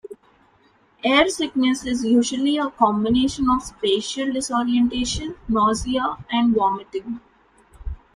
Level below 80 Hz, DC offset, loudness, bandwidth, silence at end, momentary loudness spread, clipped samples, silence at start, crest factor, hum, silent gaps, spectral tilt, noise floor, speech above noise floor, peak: -42 dBFS; under 0.1%; -21 LUFS; 10.5 kHz; 0.2 s; 12 LU; under 0.1%; 0.05 s; 18 dB; none; none; -4 dB/octave; -58 dBFS; 38 dB; -2 dBFS